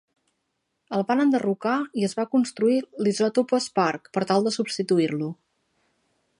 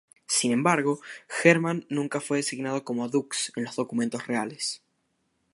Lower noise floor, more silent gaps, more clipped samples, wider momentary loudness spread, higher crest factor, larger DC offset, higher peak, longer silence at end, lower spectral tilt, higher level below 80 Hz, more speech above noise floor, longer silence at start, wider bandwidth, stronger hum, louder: about the same, -77 dBFS vs -74 dBFS; neither; neither; second, 6 LU vs 10 LU; second, 18 dB vs 24 dB; neither; about the same, -6 dBFS vs -4 dBFS; first, 1.05 s vs 0.8 s; first, -5.5 dB/octave vs -4 dB/octave; about the same, -76 dBFS vs -78 dBFS; first, 53 dB vs 47 dB; first, 0.9 s vs 0.3 s; about the same, 11 kHz vs 11.5 kHz; neither; first, -24 LUFS vs -27 LUFS